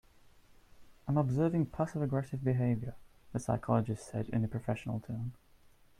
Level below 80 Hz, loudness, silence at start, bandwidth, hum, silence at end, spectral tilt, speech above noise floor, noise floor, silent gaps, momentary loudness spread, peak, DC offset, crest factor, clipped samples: -58 dBFS; -34 LUFS; 0.8 s; 12 kHz; none; 0.65 s; -8.5 dB/octave; 29 dB; -62 dBFS; none; 10 LU; -14 dBFS; under 0.1%; 20 dB; under 0.1%